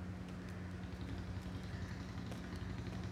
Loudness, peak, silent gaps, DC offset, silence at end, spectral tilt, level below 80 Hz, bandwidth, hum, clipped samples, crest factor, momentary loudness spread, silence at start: -47 LUFS; -32 dBFS; none; under 0.1%; 0 s; -6.5 dB/octave; -54 dBFS; 15 kHz; none; under 0.1%; 12 dB; 2 LU; 0 s